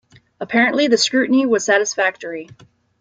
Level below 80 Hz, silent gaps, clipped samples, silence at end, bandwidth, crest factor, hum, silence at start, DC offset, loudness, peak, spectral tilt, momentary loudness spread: -66 dBFS; none; under 0.1%; 0.55 s; 9.4 kHz; 16 dB; none; 0.4 s; under 0.1%; -16 LUFS; -2 dBFS; -2.5 dB/octave; 15 LU